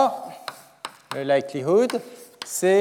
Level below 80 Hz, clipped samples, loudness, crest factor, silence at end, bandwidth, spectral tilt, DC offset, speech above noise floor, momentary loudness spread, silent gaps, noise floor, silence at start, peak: -84 dBFS; under 0.1%; -24 LUFS; 16 dB; 0 s; 17 kHz; -4.5 dB/octave; under 0.1%; 20 dB; 18 LU; none; -41 dBFS; 0 s; -8 dBFS